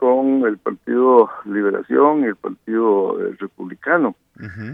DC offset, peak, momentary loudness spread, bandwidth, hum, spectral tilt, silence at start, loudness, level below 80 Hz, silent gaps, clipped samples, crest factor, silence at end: under 0.1%; 0 dBFS; 17 LU; 5.4 kHz; none; -9.5 dB/octave; 0 s; -18 LUFS; -66 dBFS; none; under 0.1%; 18 dB; 0 s